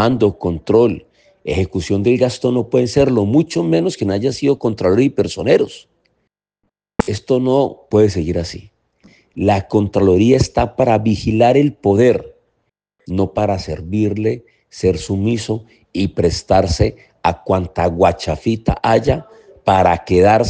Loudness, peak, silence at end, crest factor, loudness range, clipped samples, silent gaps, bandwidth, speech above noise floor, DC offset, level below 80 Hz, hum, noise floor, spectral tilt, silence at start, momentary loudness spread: -16 LUFS; 0 dBFS; 0 s; 16 dB; 5 LU; under 0.1%; none; 9.6 kHz; 57 dB; under 0.1%; -38 dBFS; none; -72 dBFS; -6.5 dB/octave; 0 s; 9 LU